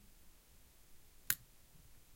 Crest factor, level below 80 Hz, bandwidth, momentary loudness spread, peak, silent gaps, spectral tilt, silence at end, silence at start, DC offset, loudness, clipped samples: 36 dB; -66 dBFS; 16.5 kHz; 26 LU; -14 dBFS; none; 0 dB/octave; 0 s; 0 s; under 0.1%; -40 LUFS; under 0.1%